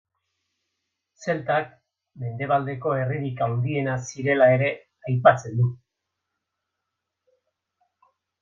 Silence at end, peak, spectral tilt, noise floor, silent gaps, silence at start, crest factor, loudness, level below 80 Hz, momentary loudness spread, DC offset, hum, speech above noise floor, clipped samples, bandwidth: 2.65 s; -2 dBFS; -7 dB/octave; -83 dBFS; none; 1.2 s; 24 dB; -23 LUFS; -66 dBFS; 14 LU; under 0.1%; none; 60 dB; under 0.1%; 7.6 kHz